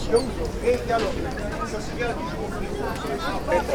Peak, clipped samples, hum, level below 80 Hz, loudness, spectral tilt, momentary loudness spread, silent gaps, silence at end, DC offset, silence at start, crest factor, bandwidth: -8 dBFS; under 0.1%; none; -36 dBFS; -27 LUFS; -5.5 dB/octave; 6 LU; none; 0 s; under 0.1%; 0 s; 18 dB; over 20 kHz